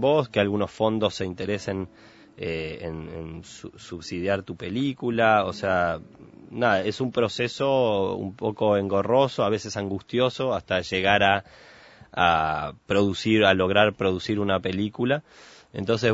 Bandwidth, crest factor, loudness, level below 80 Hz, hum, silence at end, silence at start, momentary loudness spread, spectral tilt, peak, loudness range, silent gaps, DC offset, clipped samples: 8 kHz; 22 dB; -24 LUFS; -54 dBFS; none; 0 s; 0 s; 14 LU; -5.5 dB/octave; -2 dBFS; 8 LU; none; under 0.1%; under 0.1%